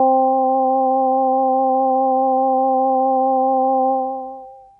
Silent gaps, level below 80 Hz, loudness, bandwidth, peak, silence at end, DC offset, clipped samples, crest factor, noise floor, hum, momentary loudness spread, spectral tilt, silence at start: none; -66 dBFS; -17 LUFS; 1.2 kHz; -6 dBFS; 0.2 s; under 0.1%; under 0.1%; 12 dB; -37 dBFS; none; 5 LU; -11 dB/octave; 0 s